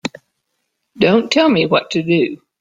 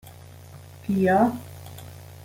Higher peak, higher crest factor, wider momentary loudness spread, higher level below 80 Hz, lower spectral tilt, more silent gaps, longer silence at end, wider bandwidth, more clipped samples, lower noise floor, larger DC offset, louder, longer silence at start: first, -2 dBFS vs -8 dBFS; about the same, 16 dB vs 20 dB; second, 6 LU vs 25 LU; first, -56 dBFS vs -62 dBFS; second, -5.5 dB/octave vs -7.5 dB/octave; neither; first, 0.25 s vs 0.1 s; second, 9 kHz vs 17 kHz; neither; first, -72 dBFS vs -45 dBFS; neither; first, -15 LUFS vs -22 LUFS; about the same, 0.05 s vs 0.05 s